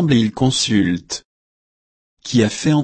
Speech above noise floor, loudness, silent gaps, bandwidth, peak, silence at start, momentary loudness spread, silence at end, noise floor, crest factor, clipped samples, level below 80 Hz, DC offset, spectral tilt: over 74 dB; -17 LUFS; 1.25-2.17 s; 8.8 kHz; -2 dBFS; 0 s; 13 LU; 0 s; under -90 dBFS; 16 dB; under 0.1%; -48 dBFS; under 0.1%; -5 dB/octave